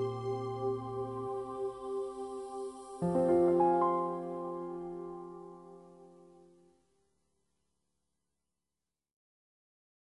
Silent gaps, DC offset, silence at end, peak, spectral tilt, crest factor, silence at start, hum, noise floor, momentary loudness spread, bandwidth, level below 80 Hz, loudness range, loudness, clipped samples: none; under 0.1%; 3.9 s; -16 dBFS; -8.5 dB/octave; 20 dB; 0 s; none; under -90 dBFS; 19 LU; 11.5 kHz; -68 dBFS; 16 LU; -34 LUFS; under 0.1%